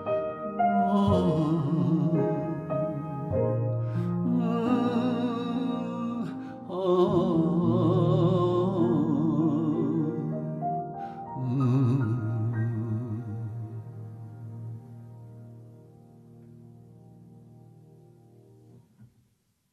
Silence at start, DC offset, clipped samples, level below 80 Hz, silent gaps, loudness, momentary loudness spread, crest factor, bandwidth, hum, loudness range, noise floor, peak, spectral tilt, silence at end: 0 s; under 0.1%; under 0.1%; -60 dBFS; none; -27 LUFS; 17 LU; 18 dB; 7.6 kHz; none; 16 LU; -70 dBFS; -10 dBFS; -10 dB/octave; 0.65 s